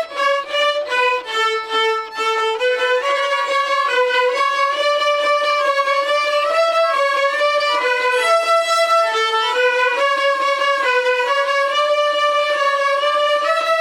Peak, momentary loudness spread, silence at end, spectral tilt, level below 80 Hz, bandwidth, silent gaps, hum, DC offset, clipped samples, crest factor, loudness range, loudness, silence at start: -6 dBFS; 3 LU; 0 s; 1.5 dB/octave; -70 dBFS; 16 kHz; none; none; under 0.1%; under 0.1%; 12 dB; 2 LU; -16 LUFS; 0 s